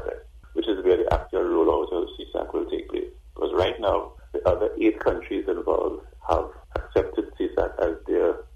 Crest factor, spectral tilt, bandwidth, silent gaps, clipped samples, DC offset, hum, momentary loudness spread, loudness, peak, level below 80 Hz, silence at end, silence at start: 18 dB; -7.5 dB/octave; 8.2 kHz; none; under 0.1%; under 0.1%; none; 11 LU; -26 LUFS; -6 dBFS; -40 dBFS; 0 s; 0 s